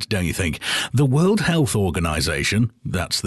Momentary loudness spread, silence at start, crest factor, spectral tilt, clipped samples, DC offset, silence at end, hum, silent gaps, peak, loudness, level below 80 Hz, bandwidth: 6 LU; 0 s; 12 dB; -5 dB/octave; under 0.1%; under 0.1%; 0 s; none; none; -8 dBFS; -20 LUFS; -36 dBFS; 12.5 kHz